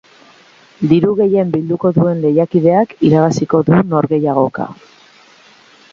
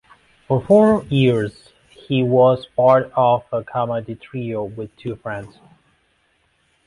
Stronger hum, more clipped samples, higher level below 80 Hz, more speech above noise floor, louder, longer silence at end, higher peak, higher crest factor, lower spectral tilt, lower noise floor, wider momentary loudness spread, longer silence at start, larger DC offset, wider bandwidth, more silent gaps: neither; neither; about the same, -52 dBFS vs -52 dBFS; second, 33 dB vs 45 dB; first, -13 LUFS vs -18 LUFS; second, 1.2 s vs 1.4 s; about the same, 0 dBFS vs -2 dBFS; about the same, 14 dB vs 16 dB; about the same, -8.5 dB/octave vs -8.5 dB/octave; second, -45 dBFS vs -63 dBFS; second, 5 LU vs 16 LU; first, 0.8 s vs 0.5 s; neither; second, 7.4 kHz vs 11 kHz; neither